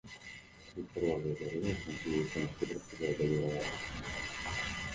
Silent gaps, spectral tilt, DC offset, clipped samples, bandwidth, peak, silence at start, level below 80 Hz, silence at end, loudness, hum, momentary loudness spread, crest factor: none; -5.5 dB/octave; under 0.1%; under 0.1%; 9.8 kHz; -20 dBFS; 0.05 s; -54 dBFS; 0 s; -37 LUFS; none; 14 LU; 18 dB